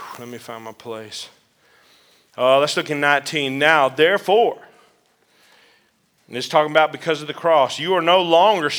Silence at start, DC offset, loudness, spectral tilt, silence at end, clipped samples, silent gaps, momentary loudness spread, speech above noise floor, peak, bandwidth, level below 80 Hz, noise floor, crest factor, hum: 0 s; under 0.1%; -17 LUFS; -3.5 dB/octave; 0 s; under 0.1%; none; 19 LU; 44 dB; 0 dBFS; over 20 kHz; -80 dBFS; -62 dBFS; 20 dB; none